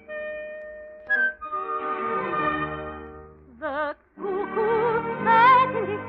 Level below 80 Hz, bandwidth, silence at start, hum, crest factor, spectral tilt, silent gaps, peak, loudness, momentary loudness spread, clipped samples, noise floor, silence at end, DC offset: -54 dBFS; 5.4 kHz; 0.1 s; none; 18 dB; -8 dB/octave; none; -6 dBFS; -23 LUFS; 20 LU; under 0.1%; -45 dBFS; 0 s; under 0.1%